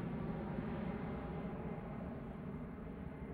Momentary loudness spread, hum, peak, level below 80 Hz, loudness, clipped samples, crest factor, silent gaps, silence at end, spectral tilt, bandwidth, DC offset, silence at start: 6 LU; none; -28 dBFS; -56 dBFS; -45 LUFS; under 0.1%; 16 dB; none; 0 s; -10 dB/octave; 4.8 kHz; under 0.1%; 0 s